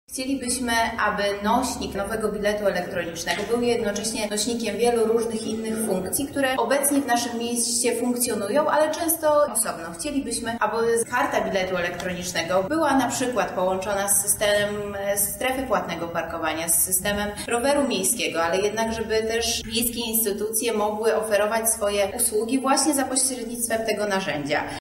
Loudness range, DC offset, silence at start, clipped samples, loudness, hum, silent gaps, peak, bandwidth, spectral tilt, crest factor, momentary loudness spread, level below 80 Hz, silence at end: 2 LU; under 0.1%; 0.1 s; under 0.1%; -23 LUFS; none; none; -6 dBFS; 16 kHz; -2.5 dB/octave; 18 dB; 7 LU; -50 dBFS; 0 s